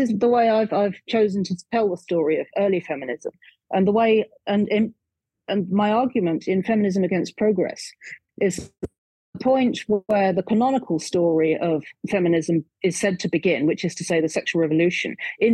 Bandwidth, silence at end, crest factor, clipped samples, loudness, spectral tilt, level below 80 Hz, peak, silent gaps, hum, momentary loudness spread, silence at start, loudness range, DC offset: 12 kHz; 0 s; 14 dB; under 0.1%; -22 LUFS; -6 dB/octave; -62 dBFS; -8 dBFS; 8.98-9.33 s; none; 8 LU; 0 s; 2 LU; under 0.1%